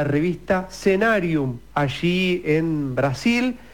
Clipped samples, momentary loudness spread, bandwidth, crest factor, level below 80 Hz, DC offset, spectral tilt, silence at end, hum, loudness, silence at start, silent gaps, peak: under 0.1%; 5 LU; 18 kHz; 14 dB; -48 dBFS; 0.4%; -6.5 dB/octave; 0.1 s; none; -21 LUFS; 0 s; none; -8 dBFS